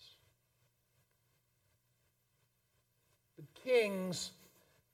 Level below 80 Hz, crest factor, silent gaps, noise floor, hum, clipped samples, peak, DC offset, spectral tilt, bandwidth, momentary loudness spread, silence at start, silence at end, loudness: -82 dBFS; 22 dB; none; -79 dBFS; 60 Hz at -80 dBFS; under 0.1%; -22 dBFS; under 0.1%; -4 dB/octave; 16.5 kHz; 14 LU; 3.4 s; 0.65 s; -36 LUFS